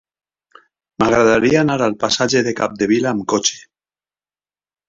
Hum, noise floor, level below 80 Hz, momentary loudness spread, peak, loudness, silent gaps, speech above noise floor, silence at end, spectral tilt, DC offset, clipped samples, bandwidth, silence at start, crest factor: 50 Hz at -45 dBFS; under -90 dBFS; -50 dBFS; 7 LU; -2 dBFS; -16 LUFS; none; over 74 dB; 1.25 s; -4 dB/octave; under 0.1%; under 0.1%; 7.8 kHz; 1 s; 16 dB